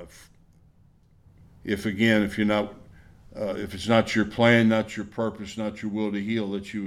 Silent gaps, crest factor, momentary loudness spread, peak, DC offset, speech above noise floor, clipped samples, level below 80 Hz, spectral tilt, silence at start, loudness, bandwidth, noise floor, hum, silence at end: none; 20 dB; 13 LU; -6 dBFS; under 0.1%; 33 dB; under 0.1%; -54 dBFS; -6 dB/octave; 0 s; -25 LUFS; 13.5 kHz; -58 dBFS; none; 0 s